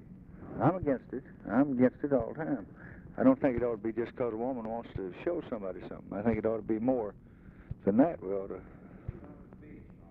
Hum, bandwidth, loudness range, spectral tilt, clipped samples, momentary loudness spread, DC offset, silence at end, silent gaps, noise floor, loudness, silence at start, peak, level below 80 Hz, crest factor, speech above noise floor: none; 4.1 kHz; 4 LU; -11 dB/octave; under 0.1%; 22 LU; under 0.1%; 0 s; none; -51 dBFS; -32 LUFS; 0 s; -12 dBFS; -56 dBFS; 20 dB; 20 dB